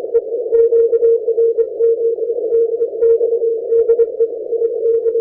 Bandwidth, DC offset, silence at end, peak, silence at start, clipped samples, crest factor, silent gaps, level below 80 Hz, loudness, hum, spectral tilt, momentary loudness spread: 2 kHz; under 0.1%; 0 s; -4 dBFS; 0 s; under 0.1%; 10 dB; none; -58 dBFS; -15 LUFS; none; -10.5 dB/octave; 6 LU